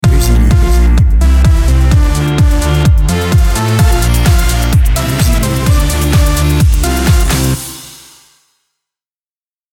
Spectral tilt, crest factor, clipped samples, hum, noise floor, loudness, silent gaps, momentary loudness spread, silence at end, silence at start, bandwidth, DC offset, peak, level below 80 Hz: -5.5 dB/octave; 10 dB; under 0.1%; none; under -90 dBFS; -11 LUFS; none; 3 LU; 1.8 s; 0.05 s; 18.5 kHz; under 0.1%; 0 dBFS; -12 dBFS